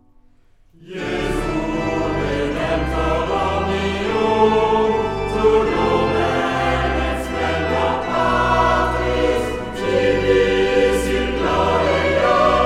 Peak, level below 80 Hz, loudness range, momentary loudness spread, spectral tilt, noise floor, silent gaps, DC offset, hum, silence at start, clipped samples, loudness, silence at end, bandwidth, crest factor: -4 dBFS; -32 dBFS; 3 LU; 6 LU; -5.5 dB/octave; -51 dBFS; none; under 0.1%; none; 0.8 s; under 0.1%; -18 LUFS; 0 s; 15 kHz; 14 dB